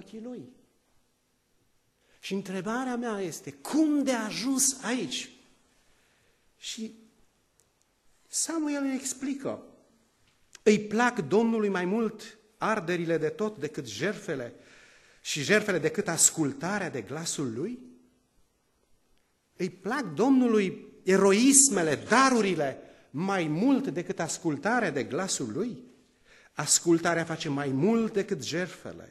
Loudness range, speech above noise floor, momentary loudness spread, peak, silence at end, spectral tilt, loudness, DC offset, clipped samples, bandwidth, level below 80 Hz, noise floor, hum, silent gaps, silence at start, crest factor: 13 LU; 44 dB; 15 LU; -6 dBFS; 0.05 s; -3.5 dB/octave; -27 LUFS; under 0.1%; under 0.1%; 13 kHz; -72 dBFS; -72 dBFS; none; none; 0 s; 24 dB